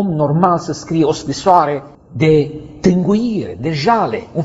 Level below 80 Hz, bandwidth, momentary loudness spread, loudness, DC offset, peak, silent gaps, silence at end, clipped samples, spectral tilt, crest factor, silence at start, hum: -44 dBFS; 8 kHz; 8 LU; -15 LUFS; under 0.1%; 0 dBFS; none; 0 s; under 0.1%; -7 dB/octave; 14 dB; 0 s; none